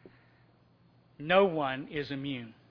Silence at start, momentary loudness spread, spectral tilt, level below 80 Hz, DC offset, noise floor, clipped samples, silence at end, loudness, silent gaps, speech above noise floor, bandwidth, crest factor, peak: 1.2 s; 15 LU; -8 dB/octave; -66 dBFS; under 0.1%; -64 dBFS; under 0.1%; 0.2 s; -30 LUFS; none; 33 dB; 5.4 kHz; 22 dB; -10 dBFS